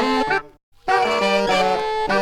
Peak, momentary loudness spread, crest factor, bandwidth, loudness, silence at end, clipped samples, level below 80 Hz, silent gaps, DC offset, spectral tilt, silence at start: -6 dBFS; 5 LU; 14 dB; 15.5 kHz; -19 LUFS; 0 s; under 0.1%; -46 dBFS; 0.63-0.72 s; under 0.1%; -4 dB/octave; 0 s